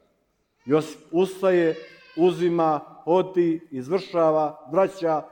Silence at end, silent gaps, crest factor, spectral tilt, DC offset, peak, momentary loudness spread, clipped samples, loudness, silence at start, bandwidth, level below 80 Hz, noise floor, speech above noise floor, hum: 0.05 s; none; 16 dB; -7 dB/octave; under 0.1%; -8 dBFS; 7 LU; under 0.1%; -23 LUFS; 0.65 s; 18 kHz; -72 dBFS; -70 dBFS; 47 dB; none